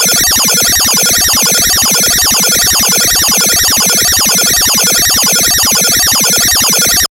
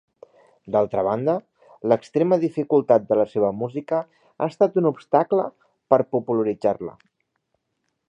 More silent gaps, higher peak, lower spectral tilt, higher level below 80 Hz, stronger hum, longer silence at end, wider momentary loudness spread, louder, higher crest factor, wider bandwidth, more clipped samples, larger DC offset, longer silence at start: neither; about the same, 0 dBFS vs -2 dBFS; second, 0 dB/octave vs -9 dB/octave; first, -32 dBFS vs -66 dBFS; neither; second, 0.05 s vs 1.2 s; second, 0 LU vs 10 LU; first, -6 LUFS vs -22 LUFS; second, 8 dB vs 20 dB; first, 16.5 kHz vs 8.8 kHz; neither; neither; second, 0 s vs 0.65 s